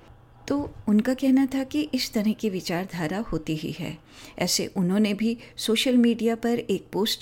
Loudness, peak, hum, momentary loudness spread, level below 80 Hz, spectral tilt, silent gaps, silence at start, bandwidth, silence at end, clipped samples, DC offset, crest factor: -25 LUFS; -10 dBFS; none; 9 LU; -52 dBFS; -4.5 dB/octave; none; 0.45 s; 17 kHz; 0 s; under 0.1%; under 0.1%; 14 dB